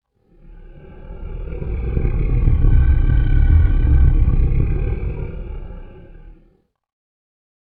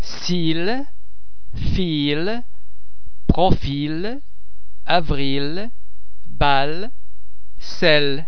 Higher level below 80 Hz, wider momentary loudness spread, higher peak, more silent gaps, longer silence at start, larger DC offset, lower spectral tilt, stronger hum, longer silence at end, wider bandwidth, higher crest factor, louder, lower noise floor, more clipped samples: first, -18 dBFS vs -32 dBFS; about the same, 18 LU vs 19 LU; about the same, -2 dBFS vs 0 dBFS; neither; first, 0.5 s vs 0 s; second, under 0.1% vs 20%; first, -12.5 dB/octave vs -6 dB/octave; neither; first, 1.45 s vs 0.05 s; second, 3.3 kHz vs 5.4 kHz; second, 14 dB vs 20 dB; about the same, -19 LUFS vs -21 LUFS; first, -57 dBFS vs -49 dBFS; neither